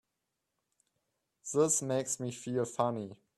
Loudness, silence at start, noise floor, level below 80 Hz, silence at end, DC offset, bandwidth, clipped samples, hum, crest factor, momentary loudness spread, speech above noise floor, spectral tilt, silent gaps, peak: -33 LUFS; 1.45 s; -86 dBFS; -76 dBFS; 0.25 s; under 0.1%; 13 kHz; under 0.1%; none; 22 dB; 9 LU; 53 dB; -4.5 dB/octave; none; -14 dBFS